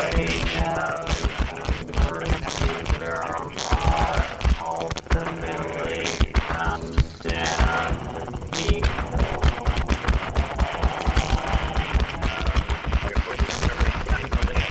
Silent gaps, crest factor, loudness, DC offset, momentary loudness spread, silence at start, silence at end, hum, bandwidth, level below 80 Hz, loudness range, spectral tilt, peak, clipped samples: none; 18 dB; -25 LUFS; under 0.1%; 5 LU; 0 s; 0 s; none; 8.4 kHz; -26 dBFS; 1 LU; -5 dB/octave; -4 dBFS; under 0.1%